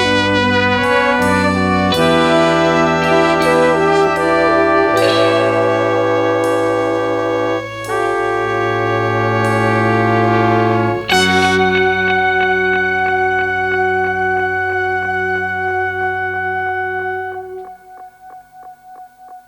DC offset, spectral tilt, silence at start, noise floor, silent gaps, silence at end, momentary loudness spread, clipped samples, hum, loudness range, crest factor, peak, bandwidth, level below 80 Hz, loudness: under 0.1%; -5 dB/octave; 0 s; -38 dBFS; none; 0.1 s; 6 LU; under 0.1%; none; 6 LU; 14 dB; 0 dBFS; 18 kHz; -46 dBFS; -14 LUFS